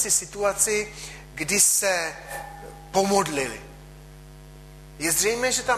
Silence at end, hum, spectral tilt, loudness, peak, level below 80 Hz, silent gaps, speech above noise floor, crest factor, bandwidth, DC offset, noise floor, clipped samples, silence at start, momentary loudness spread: 0 s; none; -1.5 dB/octave; -22 LUFS; -6 dBFS; -48 dBFS; none; 20 dB; 20 dB; 14.5 kHz; under 0.1%; -44 dBFS; under 0.1%; 0 s; 19 LU